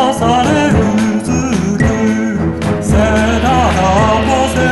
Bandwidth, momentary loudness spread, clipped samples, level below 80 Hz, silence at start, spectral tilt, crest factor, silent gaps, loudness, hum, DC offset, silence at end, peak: 12 kHz; 4 LU; under 0.1%; -24 dBFS; 0 s; -6 dB/octave; 10 dB; none; -12 LUFS; none; under 0.1%; 0 s; 0 dBFS